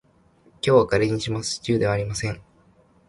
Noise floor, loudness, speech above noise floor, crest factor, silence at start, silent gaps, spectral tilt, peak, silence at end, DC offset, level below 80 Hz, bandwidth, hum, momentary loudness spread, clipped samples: -58 dBFS; -23 LUFS; 36 dB; 18 dB; 0.65 s; none; -5 dB/octave; -4 dBFS; 0.7 s; under 0.1%; -48 dBFS; 11.5 kHz; none; 11 LU; under 0.1%